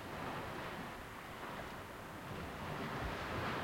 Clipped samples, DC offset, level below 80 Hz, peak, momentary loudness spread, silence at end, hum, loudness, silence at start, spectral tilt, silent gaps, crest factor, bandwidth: under 0.1%; under 0.1%; -58 dBFS; -28 dBFS; 7 LU; 0 s; none; -45 LUFS; 0 s; -5 dB/octave; none; 16 dB; 16.5 kHz